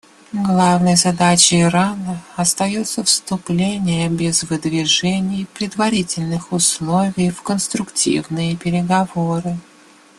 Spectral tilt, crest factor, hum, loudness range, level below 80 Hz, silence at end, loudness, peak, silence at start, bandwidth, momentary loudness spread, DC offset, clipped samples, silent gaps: -4 dB/octave; 18 dB; none; 4 LU; -52 dBFS; 0.6 s; -17 LUFS; 0 dBFS; 0.3 s; 12.5 kHz; 9 LU; under 0.1%; under 0.1%; none